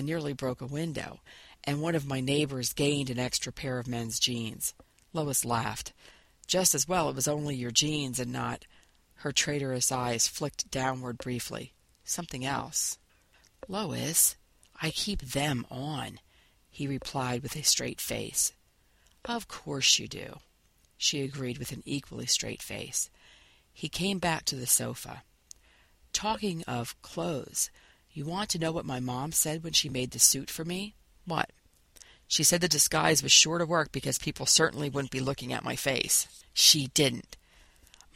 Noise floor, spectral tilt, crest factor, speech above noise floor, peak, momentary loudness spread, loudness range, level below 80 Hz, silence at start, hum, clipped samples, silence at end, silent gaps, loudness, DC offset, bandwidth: -66 dBFS; -2.5 dB/octave; 26 dB; 36 dB; -6 dBFS; 15 LU; 8 LU; -56 dBFS; 0 s; none; under 0.1%; 0.8 s; none; -28 LUFS; under 0.1%; 16 kHz